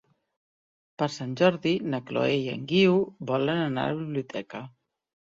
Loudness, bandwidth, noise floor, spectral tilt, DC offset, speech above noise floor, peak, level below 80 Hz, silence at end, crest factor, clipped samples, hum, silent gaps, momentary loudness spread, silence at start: -26 LUFS; 7.8 kHz; under -90 dBFS; -6.5 dB/octave; under 0.1%; over 64 dB; -8 dBFS; -66 dBFS; 0.55 s; 20 dB; under 0.1%; none; none; 11 LU; 1 s